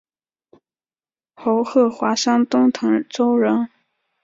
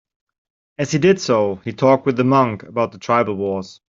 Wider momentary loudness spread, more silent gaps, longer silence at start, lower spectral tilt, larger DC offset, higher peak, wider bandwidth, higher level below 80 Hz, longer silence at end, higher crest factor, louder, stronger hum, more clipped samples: second, 5 LU vs 8 LU; neither; first, 1.4 s vs 0.8 s; second, -4.5 dB/octave vs -6 dB/octave; neither; about the same, -4 dBFS vs -2 dBFS; about the same, 7.6 kHz vs 7.6 kHz; second, -66 dBFS vs -58 dBFS; first, 0.55 s vs 0.2 s; about the same, 16 dB vs 16 dB; about the same, -18 LUFS vs -18 LUFS; neither; neither